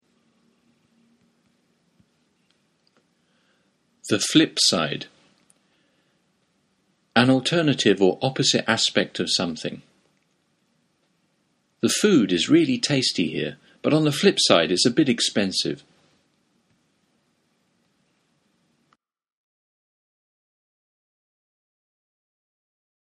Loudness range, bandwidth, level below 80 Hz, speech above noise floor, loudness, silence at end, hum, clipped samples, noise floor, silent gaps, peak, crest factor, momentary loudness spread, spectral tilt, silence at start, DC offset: 7 LU; 13 kHz; -66 dBFS; 48 dB; -20 LUFS; 7.25 s; none; under 0.1%; -69 dBFS; none; 0 dBFS; 26 dB; 11 LU; -4 dB/octave; 4.05 s; under 0.1%